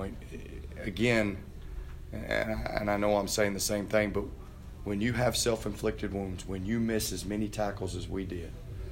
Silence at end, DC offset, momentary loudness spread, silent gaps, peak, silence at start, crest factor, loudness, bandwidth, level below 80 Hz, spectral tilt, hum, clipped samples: 0 s; under 0.1%; 16 LU; none; -12 dBFS; 0 s; 20 dB; -31 LUFS; 16 kHz; -44 dBFS; -4.5 dB/octave; none; under 0.1%